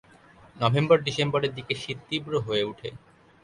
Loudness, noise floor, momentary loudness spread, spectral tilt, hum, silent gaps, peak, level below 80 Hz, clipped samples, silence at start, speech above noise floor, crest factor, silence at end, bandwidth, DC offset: -26 LUFS; -54 dBFS; 11 LU; -6 dB/octave; none; none; -6 dBFS; -60 dBFS; under 0.1%; 0.55 s; 28 dB; 20 dB; 0.45 s; 11 kHz; under 0.1%